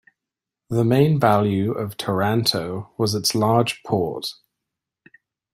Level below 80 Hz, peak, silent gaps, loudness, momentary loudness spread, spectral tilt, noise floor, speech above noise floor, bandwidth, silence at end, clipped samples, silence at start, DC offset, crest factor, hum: -58 dBFS; -2 dBFS; none; -21 LUFS; 10 LU; -5.5 dB/octave; -86 dBFS; 66 dB; 16 kHz; 1.2 s; under 0.1%; 0.7 s; under 0.1%; 20 dB; none